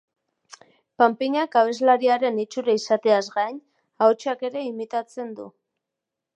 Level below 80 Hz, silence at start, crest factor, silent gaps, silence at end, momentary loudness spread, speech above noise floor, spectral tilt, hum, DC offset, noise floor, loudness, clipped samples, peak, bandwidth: -82 dBFS; 1 s; 20 dB; none; 0.85 s; 15 LU; 63 dB; -4 dB/octave; none; under 0.1%; -85 dBFS; -22 LUFS; under 0.1%; -2 dBFS; 9.2 kHz